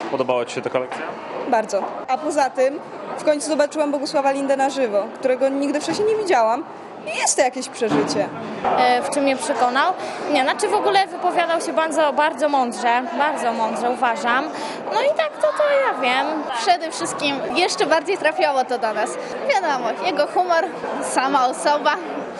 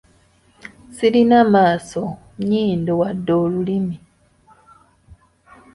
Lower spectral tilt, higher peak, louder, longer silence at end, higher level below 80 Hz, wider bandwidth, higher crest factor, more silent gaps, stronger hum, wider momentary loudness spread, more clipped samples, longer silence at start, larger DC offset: second, -2.5 dB/octave vs -7 dB/octave; about the same, -4 dBFS vs -2 dBFS; about the same, -20 LUFS vs -18 LUFS; second, 0 s vs 0.6 s; second, -72 dBFS vs -52 dBFS; about the same, 12 kHz vs 11.5 kHz; about the same, 16 dB vs 18 dB; neither; neither; second, 7 LU vs 14 LU; neither; second, 0 s vs 0.65 s; neither